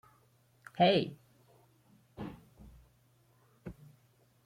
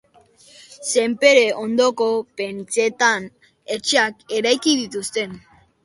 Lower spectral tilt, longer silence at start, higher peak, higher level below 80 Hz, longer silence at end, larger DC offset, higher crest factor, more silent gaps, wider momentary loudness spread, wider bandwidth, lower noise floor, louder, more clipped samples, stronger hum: first, -7 dB/octave vs -2 dB/octave; about the same, 0.75 s vs 0.7 s; second, -16 dBFS vs 0 dBFS; about the same, -66 dBFS vs -66 dBFS; first, 0.75 s vs 0.45 s; neither; about the same, 22 dB vs 20 dB; neither; first, 30 LU vs 14 LU; first, 15.5 kHz vs 11.5 kHz; first, -68 dBFS vs -52 dBFS; second, -32 LUFS vs -19 LUFS; neither; neither